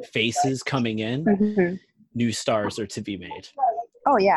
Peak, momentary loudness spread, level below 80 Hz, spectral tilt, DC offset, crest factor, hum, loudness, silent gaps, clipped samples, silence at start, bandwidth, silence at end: -8 dBFS; 12 LU; -60 dBFS; -5 dB/octave; under 0.1%; 16 dB; none; -24 LUFS; none; under 0.1%; 0 s; 12.5 kHz; 0 s